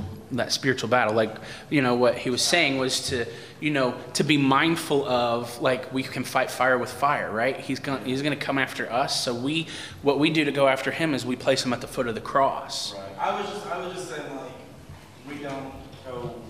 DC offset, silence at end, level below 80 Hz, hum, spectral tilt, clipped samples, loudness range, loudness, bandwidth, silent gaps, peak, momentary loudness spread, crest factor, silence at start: 0.1%; 0 s; -60 dBFS; none; -4 dB/octave; under 0.1%; 6 LU; -25 LUFS; 15.5 kHz; none; -4 dBFS; 13 LU; 20 dB; 0 s